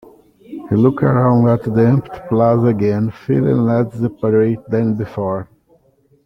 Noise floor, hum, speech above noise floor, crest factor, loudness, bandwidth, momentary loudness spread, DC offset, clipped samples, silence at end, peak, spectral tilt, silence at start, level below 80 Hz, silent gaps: -55 dBFS; none; 41 dB; 14 dB; -16 LUFS; 5.8 kHz; 8 LU; under 0.1%; under 0.1%; 0.8 s; -2 dBFS; -11 dB/octave; 0.5 s; -48 dBFS; none